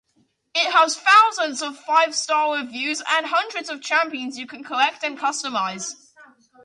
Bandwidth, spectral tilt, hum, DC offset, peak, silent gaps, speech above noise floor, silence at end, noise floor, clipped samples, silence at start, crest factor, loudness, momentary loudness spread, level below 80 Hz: 11.5 kHz; -0.5 dB/octave; none; under 0.1%; -4 dBFS; none; 45 dB; 0.4 s; -66 dBFS; under 0.1%; 0.55 s; 18 dB; -20 LUFS; 15 LU; -78 dBFS